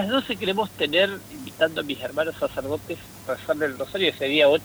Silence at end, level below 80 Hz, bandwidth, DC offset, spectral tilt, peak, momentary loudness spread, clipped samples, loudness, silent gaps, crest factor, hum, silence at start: 0 s; -56 dBFS; over 20 kHz; under 0.1%; -4.5 dB/octave; -6 dBFS; 11 LU; under 0.1%; -24 LUFS; none; 18 dB; none; 0 s